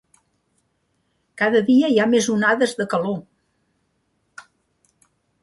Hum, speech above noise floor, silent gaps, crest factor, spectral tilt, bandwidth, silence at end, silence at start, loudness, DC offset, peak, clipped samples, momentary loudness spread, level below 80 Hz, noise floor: none; 51 dB; none; 18 dB; -4.5 dB/octave; 11.5 kHz; 2.2 s; 1.35 s; -19 LUFS; under 0.1%; -4 dBFS; under 0.1%; 8 LU; -68 dBFS; -69 dBFS